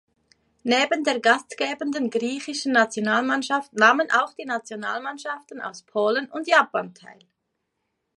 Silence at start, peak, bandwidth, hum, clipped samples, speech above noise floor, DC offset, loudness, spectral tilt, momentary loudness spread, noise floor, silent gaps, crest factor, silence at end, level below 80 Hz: 0.65 s; -2 dBFS; 11.5 kHz; none; under 0.1%; 54 dB; under 0.1%; -23 LUFS; -3 dB/octave; 13 LU; -78 dBFS; none; 22 dB; 1.05 s; -76 dBFS